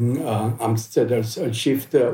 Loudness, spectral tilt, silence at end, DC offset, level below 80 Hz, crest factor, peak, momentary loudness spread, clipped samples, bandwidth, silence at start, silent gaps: -22 LUFS; -6 dB/octave; 0 s; under 0.1%; -66 dBFS; 14 dB; -6 dBFS; 4 LU; under 0.1%; 17 kHz; 0 s; none